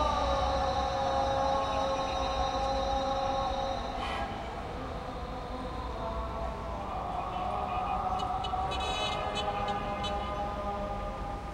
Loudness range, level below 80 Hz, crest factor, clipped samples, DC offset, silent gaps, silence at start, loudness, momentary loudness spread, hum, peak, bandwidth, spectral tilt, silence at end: 6 LU; -42 dBFS; 16 dB; under 0.1%; under 0.1%; none; 0 s; -33 LUFS; 9 LU; none; -16 dBFS; 12.5 kHz; -5 dB/octave; 0 s